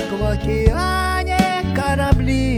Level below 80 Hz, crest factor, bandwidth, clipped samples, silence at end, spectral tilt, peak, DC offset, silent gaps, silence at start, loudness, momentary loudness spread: -24 dBFS; 18 dB; 18 kHz; under 0.1%; 0 s; -6 dB/octave; 0 dBFS; under 0.1%; none; 0 s; -18 LUFS; 3 LU